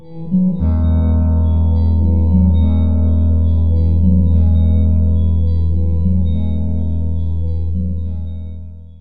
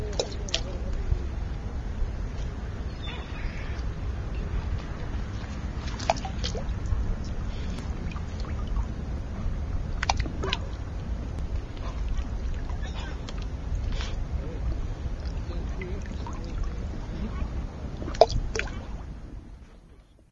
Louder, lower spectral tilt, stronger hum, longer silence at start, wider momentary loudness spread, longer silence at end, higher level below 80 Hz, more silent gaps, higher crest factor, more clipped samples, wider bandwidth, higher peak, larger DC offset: first, -16 LUFS vs -33 LUFS; first, -12.5 dB/octave vs -5.5 dB/octave; neither; about the same, 0 s vs 0 s; about the same, 8 LU vs 7 LU; about the same, 0 s vs 0.1 s; first, -22 dBFS vs -32 dBFS; neither; second, 12 dB vs 30 dB; neither; second, 3.9 kHz vs 7.8 kHz; about the same, -2 dBFS vs 0 dBFS; first, 9% vs under 0.1%